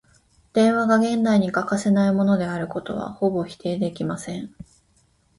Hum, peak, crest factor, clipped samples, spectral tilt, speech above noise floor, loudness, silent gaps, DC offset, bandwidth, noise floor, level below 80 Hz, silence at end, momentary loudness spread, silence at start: none; -6 dBFS; 16 dB; under 0.1%; -6.5 dB/octave; 41 dB; -22 LUFS; none; under 0.1%; 11.5 kHz; -62 dBFS; -58 dBFS; 0.9 s; 11 LU; 0.55 s